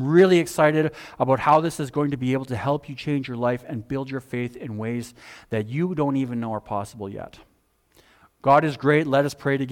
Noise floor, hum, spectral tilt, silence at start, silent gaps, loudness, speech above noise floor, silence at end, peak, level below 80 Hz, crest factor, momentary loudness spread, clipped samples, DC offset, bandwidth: -62 dBFS; none; -6.5 dB/octave; 0 s; none; -23 LUFS; 40 dB; 0 s; -6 dBFS; -58 dBFS; 16 dB; 13 LU; under 0.1%; under 0.1%; 17 kHz